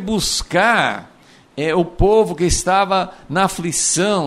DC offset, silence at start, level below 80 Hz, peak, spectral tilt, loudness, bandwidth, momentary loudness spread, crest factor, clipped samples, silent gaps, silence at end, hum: under 0.1%; 0 s; -32 dBFS; -2 dBFS; -3.5 dB/octave; -17 LUFS; 15.5 kHz; 7 LU; 16 dB; under 0.1%; none; 0 s; none